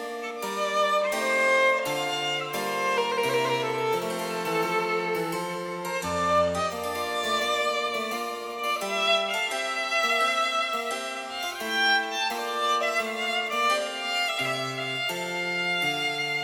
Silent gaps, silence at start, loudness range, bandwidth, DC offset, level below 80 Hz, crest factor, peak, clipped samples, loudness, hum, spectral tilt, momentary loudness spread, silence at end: none; 0 s; 2 LU; 18 kHz; under 0.1%; -66 dBFS; 14 dB; -12 dBFS; under 0.1%; -26 LUFS; none; -2.5 dB/octave; 8 LU; 0 s